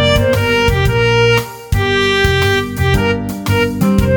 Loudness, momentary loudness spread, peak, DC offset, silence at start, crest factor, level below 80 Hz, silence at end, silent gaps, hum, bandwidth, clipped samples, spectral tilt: -13 LUFS; 5 LU; 0 dBFS; under 0.1%; 0 s; 12 dB; -24 dBFS; 0 s; none; none; over 20 kHz; under 0.1%; -5.5 dB/octave